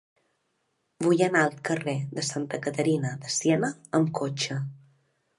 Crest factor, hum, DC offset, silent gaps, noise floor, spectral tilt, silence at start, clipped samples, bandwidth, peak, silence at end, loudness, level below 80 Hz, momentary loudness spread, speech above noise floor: 20 dB; none; under 0.1%; none; -75 dBFS; -5 dB/octave; 1 s; under 0.1%; 11.5 kHz; -8 dBFS; 0.6 s; -27 LUFS; -72 dBFS; 8 LU; 49 dB